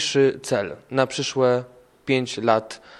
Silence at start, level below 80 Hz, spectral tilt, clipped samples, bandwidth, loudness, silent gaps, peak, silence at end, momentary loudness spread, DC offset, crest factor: 0 s; -64 dBFS; -4.5 dB/octave; under 0.1%; 12.5 kHz; -22 LUFS; none; -2 dBFS; 0.05 s; 6 LU; under 0.1%; 20 dB